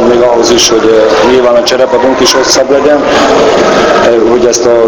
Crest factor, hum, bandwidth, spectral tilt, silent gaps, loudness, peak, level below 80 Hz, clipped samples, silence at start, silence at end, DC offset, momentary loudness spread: 6 dB; none; 19 kHz; -3 dB/octave; none; -6 LUFS; 0 dBFS; -34 dBFS; 3%; 0 s; 0 s; 0.3%; 2 LU